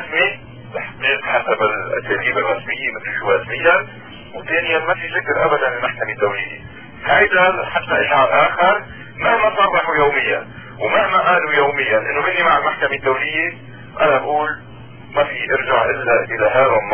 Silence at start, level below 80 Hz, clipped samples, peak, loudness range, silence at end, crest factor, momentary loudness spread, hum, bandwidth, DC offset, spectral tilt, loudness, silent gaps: 0 s; -48 dBFS; under 0.1%; 0 dBFS; 3 LU; 0 s; 16 dB; 12 LU; none; 3.4 kHz; 0.6%; -7.5 dB/octave; -16 LUFS; none